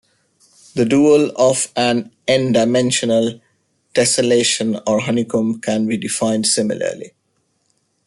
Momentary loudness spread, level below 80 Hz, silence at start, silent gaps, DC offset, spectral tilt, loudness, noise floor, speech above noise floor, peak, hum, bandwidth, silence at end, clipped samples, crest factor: 8 LU; -58 dBFS; 0.75 s; none; under 0.1%; -4 dB/octave; -16 LUFS; -66 dBFS; 50 dB; -2 dBFS; none; 12 kHz; 1 s; under 0.1%; 14 dB